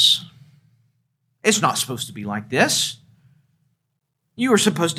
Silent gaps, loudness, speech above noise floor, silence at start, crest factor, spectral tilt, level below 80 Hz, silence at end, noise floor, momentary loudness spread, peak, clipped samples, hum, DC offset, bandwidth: none; -20 LUFS; 55 dB; 0 s; 22 dB; -2.5 dB/octave; -70 dBFS; 0 s; -75 dBFS; 11 LU; -2 dBFS; under 0.1%; none; under 0.1%; 16 kHz